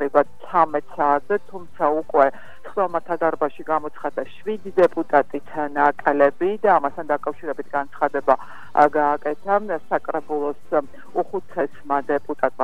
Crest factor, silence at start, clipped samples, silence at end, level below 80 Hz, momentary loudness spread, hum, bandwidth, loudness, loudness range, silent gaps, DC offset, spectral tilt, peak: 20 dB; 0 s; under 0.1%; 0 s; -62 dBFS; 10 LU; none; 10.5 kHz; -22 LUFS; 3 LU; none; 2%; -7 dB/octave; -2 dBFS